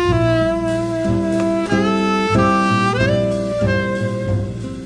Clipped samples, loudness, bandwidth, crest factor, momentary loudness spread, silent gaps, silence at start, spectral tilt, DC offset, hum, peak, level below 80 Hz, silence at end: under 0.1%; -17 LUFS; 10.5 kHz; 14 dB; 6 LU; none; 0 s; -6.5 dB/octave; under 0.1%; none; -4 dBFS; -34 dBFS; 0 s